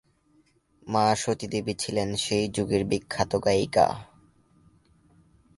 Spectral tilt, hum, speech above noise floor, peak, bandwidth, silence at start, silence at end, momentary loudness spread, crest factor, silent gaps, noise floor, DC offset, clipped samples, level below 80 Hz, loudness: -4.5 dB/octave; none; 39 dB; -8 dBFS; 11.5 kHz; 0.85 s; 1.5 s; 6 LU; 20 dB; none; -64 dBFS; under 0.1%; under 0.1%; -54 dBFS; -26 LUFS